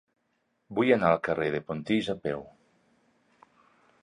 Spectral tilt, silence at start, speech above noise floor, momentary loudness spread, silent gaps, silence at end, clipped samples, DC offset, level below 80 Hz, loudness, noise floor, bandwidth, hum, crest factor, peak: -7 dB/octave; 0.7 s; 48 dB; 12 LU; none; 1.55 s; under 0.1%; under 0.1%; -62 dBFS; -28 LUFS; -75 dBFS; 11 kHz; none; 22 dB; -8 dBFS